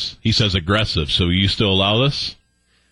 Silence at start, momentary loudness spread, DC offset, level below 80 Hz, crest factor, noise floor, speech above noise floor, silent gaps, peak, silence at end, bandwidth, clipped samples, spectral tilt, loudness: 0 s; 4 LU; under 0.1%; -36 dBFS; 14 dB; -61 dBFS; 44 dB; none; -4 dBFS; 0.6 s; 11.5 kHz; under 0.1%; -5 dB/octave; -17 LUFS